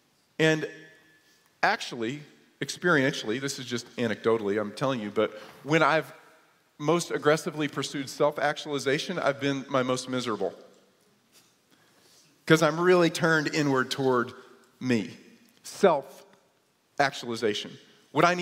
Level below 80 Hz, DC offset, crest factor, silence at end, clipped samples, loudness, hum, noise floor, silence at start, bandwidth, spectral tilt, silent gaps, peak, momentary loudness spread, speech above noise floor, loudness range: -74 dBFS; under 0.1%; 24 dB; 0 s; under 0.1%; -27 LUFS; none; -68 dBFS; 0.4 s; 16 kHz; -4.5 dB/octave; none; -6 dBFS; 13 LU; 41 dB; 5 LU